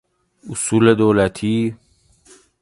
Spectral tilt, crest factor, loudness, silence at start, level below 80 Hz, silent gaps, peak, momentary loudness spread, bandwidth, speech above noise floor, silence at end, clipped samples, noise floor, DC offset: -5.5 dB/octave; 18 dB; -17 LUFS; 0.45 s; -48 dBFS; none; 0 dBFS; 11 LU; 11.5 kHz; 36 dB; 0.85 s; under 0.1%; -52 dBFS; under 0.1%